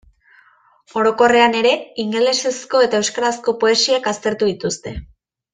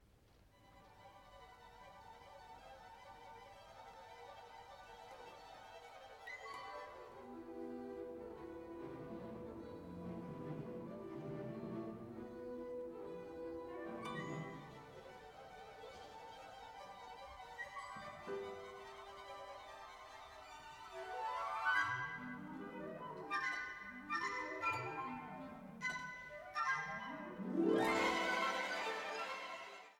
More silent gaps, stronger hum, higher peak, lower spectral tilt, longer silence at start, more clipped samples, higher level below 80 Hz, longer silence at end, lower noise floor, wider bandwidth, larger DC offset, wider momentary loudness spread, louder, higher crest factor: neither; neither; first, -2 dBFS vs -24 dBFS; second, -2.5 dB/octave vs -4.5 dB/octave; first, 0.95 s vs 0 s; neither; first, -48 dBFS vs -72 dBFS; first, 0.5 s vs 0 s; second, -53 dBFS vs -68 dBFS; second, 9.8 kHz vs 18.5 kHz; neither; second, 11 LU vs 18 LU; first, -17 LUFS vs -44 LUFS; second, 16 dB vs 22 dB